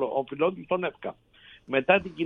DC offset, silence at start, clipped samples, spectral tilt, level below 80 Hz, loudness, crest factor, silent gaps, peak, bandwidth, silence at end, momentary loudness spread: under 0.1%; 0 s; under 0.1%; -8 dB/octave; -64 dBFS; -27 LUFS; 22 dB; none; -6 dBFS; 4.6 kHz; 0 s; 13 LU